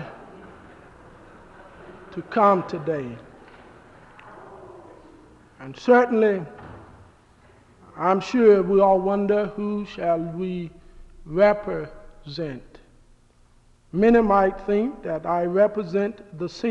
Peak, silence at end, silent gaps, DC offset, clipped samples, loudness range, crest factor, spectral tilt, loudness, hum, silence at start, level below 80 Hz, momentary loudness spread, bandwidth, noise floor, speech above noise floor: -6 dBFS; 0 s; none; under 0.1%; under 0.1%; 6 LU; 18 dB; -7.5 dB/octave; -22 LUFS; none; 0 s; -50 dBFS; 23 LU; 7.8 kHz; -56 dBFS; 35 dB